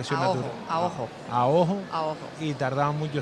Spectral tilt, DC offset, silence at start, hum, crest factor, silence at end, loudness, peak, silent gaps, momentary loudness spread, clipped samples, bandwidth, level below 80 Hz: -6.5 dB/octave; under 0.1%; 0 s; none; 18 dB; 0 s; -27 LUFS; -10 dBFS; none; 9 LU; under 0.1%; 11 kHz; -62 dBFS